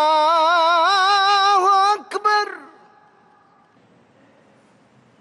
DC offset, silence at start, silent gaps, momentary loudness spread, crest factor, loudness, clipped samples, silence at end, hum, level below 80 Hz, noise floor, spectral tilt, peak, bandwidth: under 0.1%; 0 s; none; 6 LU; 12 dB; -16 LUFS; under 0.1%; 2.55 s; none; -74 dBFS; -55 dBFS; -0.5 dB/octave; -6 dBFS; 12 kHz